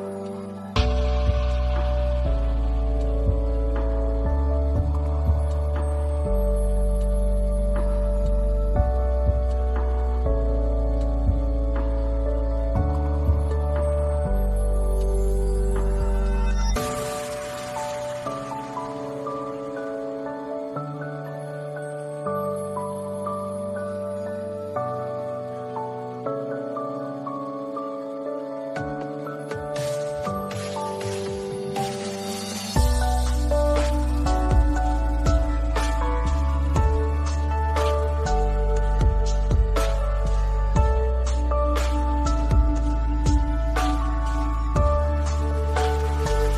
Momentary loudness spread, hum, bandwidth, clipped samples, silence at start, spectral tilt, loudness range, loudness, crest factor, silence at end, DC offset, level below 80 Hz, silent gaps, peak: 8 LU; none; 13.5 kHz; under 0.1%; 0 s; -6.5 dB/octave; 7 LU; -25 LUFS; 16 dB; 0 s; under 0.1%; -24 dBFS; none; -6 dBFS